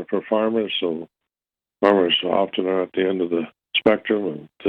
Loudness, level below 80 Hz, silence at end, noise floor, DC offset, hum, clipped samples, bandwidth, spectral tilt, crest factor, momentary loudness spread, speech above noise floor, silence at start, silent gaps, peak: -21 LUFS; -64 dBFS; 0 s; under -90 dBFS; under 0.1%; none; under 0.1%; 5.4 kHz; -7 dB/octave; 18 dB; 8 LU; over 69 dB; 0 s; none; -4 dBFS